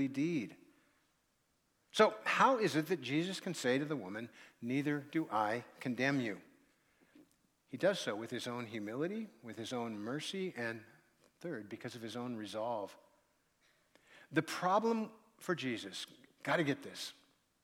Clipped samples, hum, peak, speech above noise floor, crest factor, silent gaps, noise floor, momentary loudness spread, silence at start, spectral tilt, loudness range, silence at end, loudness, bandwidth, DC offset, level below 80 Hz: under 0.1%; none; -14 dBFS; 41 dB; 24 dB; none; -78 dBFS; 16 LU; 0 s; -5 dB/octave; 9 LU; 0.5 s; -37 LUFS; 16.5 kHz; under 0.1%; -86 dBFS